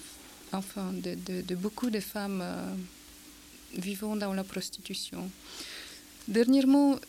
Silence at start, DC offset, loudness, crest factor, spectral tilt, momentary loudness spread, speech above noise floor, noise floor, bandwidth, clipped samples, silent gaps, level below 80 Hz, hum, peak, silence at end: 0 s; under 0.1%; -32 LUFS; 18 dB; -5 dB/octave; 22 LU; 21 dB; -52 dBFS; 16.5 kHz; under 0.1%; none; -62 dBFS; none; -14 dBFS; 0 s